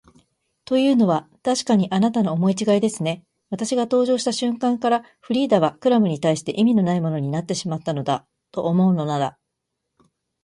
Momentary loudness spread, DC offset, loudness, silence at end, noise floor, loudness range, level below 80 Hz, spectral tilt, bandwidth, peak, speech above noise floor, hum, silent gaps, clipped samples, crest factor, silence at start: 8 LU; under 0.1%; -21 LUFS; 1.15 s; -79 dBFS; 2 LU; -64 dBFS; -6 dB/octave; 11.5 kHz; -4 dBFS; 59 dB; none; none; under 0.1%; 16 dB; 0.7 s